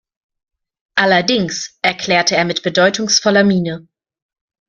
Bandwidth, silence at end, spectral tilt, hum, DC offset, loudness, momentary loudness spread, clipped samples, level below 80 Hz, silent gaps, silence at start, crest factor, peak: 7.6 kHz; 0.9 s; -3.5 dB/octave; none; under 0.1%; -14 LUFS; 8 LU; under 0.1%; -56 dBFS; none; 0.95 s; 16 dB; 0 dBFS